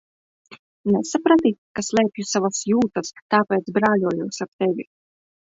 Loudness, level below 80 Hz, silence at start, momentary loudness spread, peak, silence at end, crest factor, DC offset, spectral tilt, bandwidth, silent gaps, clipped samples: -21 LUFS; -62 dBFS; 0.5 s; 11 LU; -4 dBFS; 0.7 s; 18 dB; under 0.1%; -5 dB/octave; 7.8 kHz; 0.59-0.84 s, 1.58-1.75 s, 3.22-3.29 s, 4.48-4.59 s; under 0.1%